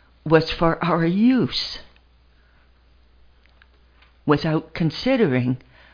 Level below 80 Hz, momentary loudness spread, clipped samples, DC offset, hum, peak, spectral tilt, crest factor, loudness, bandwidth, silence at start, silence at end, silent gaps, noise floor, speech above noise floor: -44 dBFS; 10 LU; under 0.1%; under 0.1%; none; 0 dBFS; -7.5 dB/octave; 22 dB; -21 LUFS; 5.2 kHz; 0.25 s; 0.35 s; none; -55 dBFS; 36 dB